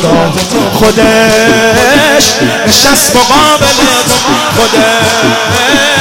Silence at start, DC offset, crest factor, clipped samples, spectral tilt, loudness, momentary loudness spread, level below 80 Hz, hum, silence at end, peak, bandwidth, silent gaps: 0 s; under 0.1%; 6 dB; 0.7%; -3 dB/octave; -6 LUFS; 4 LU; -30 dBFS; none; 0 s; 0 dBFS; over 20 kHz; none